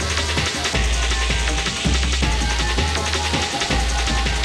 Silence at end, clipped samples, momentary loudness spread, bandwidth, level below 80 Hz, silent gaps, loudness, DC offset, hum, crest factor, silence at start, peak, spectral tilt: 0 s; under 0.1%; 1 LU; 13 kHz; -24 dBFS; none; -20 LUFS; under 0.1%; none; 14 dB; 0 s; -6 dBFS; -3 dB/octave